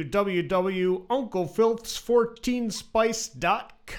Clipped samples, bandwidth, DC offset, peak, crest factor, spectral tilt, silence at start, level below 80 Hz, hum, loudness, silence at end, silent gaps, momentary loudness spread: under 0.1%; 17.5 kHz; under 0.1%; -10 dBFS; 16 dB; -4.5 dB/octave; 0 s; -52 dBFS; none; -26 LUFS; 0 s; none; 5 LU